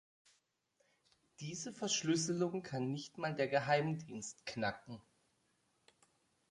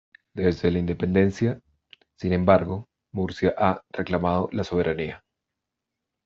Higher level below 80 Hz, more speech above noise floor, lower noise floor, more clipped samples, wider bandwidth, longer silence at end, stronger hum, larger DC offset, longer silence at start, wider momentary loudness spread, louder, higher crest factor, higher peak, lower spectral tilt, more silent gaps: second, -76 dBFS vs -54 dBFS; second, 41 dB vs 61 dB; second, -80 dBFS vs -84 dBFS; neither; first, 11.5 kHz vs 7.4 kHz; first, 1.5 s vs 1.1 s; neither; neither; first, 1.4 s vs 0.35 s; about the same, 14 LU vs 13 LU; second, -38 LUFS vs -24 LUFS; about the same, 22 dB vs 22 dB; second, -20 dBFS vs -4 dBFS; second, -4 dB/octave vs -6.5 dB/octave; neither